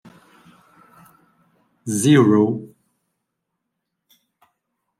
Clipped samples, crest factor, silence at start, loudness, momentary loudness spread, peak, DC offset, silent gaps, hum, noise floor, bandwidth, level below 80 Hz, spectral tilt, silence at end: under 0.1%; 20 dB; 1.85 s; -17 LUFS; 17 LU; -2 dBFS; under 0.1%; none; none; -78 dBFS; 15 kHz; -66 dBFS; -6 dB/octave; 2.35 s